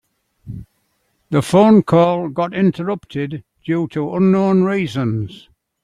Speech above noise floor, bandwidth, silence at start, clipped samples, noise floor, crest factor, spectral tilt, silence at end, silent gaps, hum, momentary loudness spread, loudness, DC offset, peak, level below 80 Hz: 50 dB; 12 kHz; 0.45 s; under 0.1%; -66 dBFS; 16 dB; -8 dB/octave; 0.5 s; none; none; 19 LU; -16 LUFS; under 0.1%; -2 dBFS; -52 dBFS